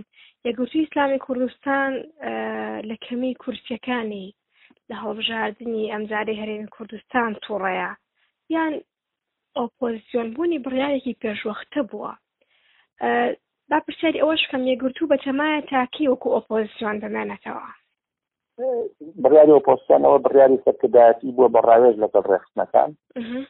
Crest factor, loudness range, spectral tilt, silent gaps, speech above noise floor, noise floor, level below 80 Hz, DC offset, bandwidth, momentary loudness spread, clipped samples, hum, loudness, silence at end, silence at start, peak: 20 dB; 12 LU; -2.5 dB/octave; none; 66 dB; -86 dBFS; -64 dBFS; under 0.1%; 4.1 kHz; 17 LU; under 0.1%; none; -21 LUFS; 0.05 s; 0.45 s; -2 dBFS